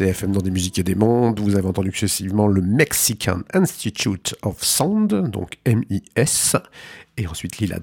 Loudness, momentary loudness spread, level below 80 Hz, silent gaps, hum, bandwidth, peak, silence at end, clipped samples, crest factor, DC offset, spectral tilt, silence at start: -20 LUFS; 9 LU; -46 dBFS; none; none; 17.5 kHz; -2 dBFS; 0 s; under 0.1%; 18 dB; under 0.1%; -4.5 dB/octave; 0 s